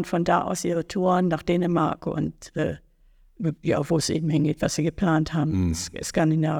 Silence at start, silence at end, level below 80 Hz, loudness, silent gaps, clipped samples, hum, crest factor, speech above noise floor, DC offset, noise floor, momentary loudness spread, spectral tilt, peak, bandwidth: 0 s; 0 s; -46 dBFS; -24 LUFS; none; under 0.1%; none; 16 dB; 33 dB; under 0.1%; -57 dBFS; 7 LU; -6 dB/octave; -8 dBFS; 16 kHz